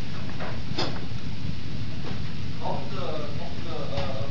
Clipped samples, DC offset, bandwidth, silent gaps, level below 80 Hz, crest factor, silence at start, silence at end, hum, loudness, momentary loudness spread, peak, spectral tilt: under 0.1%; 9%; 6 kHz; none; -44 dBFS; 18 dB; 0 s; 0 s; none; -33 LUFS; 5 LU; -12 dBFS; -6 dB/octave